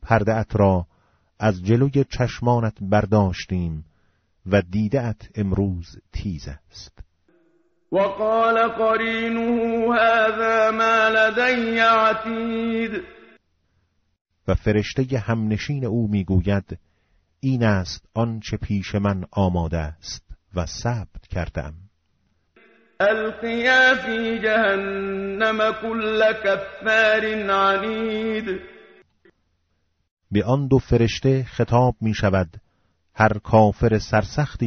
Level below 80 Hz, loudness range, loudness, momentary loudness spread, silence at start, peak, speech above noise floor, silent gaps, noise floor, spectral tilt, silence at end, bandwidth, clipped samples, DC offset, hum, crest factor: -42 dBFS; 7 LU; -21 LUFS; 13 LU; 0 s; -4 dBFS; 49 dB; 14.21-14.25 s, 30.11-30.17 s; -69 dBFS; -5 dB/octave; 0 s; 7.2 kHz; under 0.1%; under 0.1%; none; 18 dB